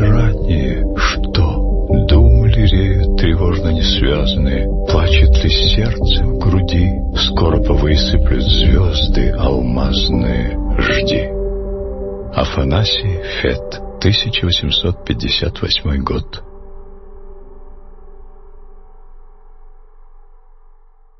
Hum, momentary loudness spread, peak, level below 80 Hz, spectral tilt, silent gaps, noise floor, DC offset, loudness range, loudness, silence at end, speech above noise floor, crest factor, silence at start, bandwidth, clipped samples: none; 8 LU; 0 dBFS; -18 dBFS; -6.5 dB/octave; none; -44 dBFS; under 0.1%; 5 LU; -15 LUFS; 1 s; 29 dB; 14 dB; 0 s; 6.2 kHz; under 0.1%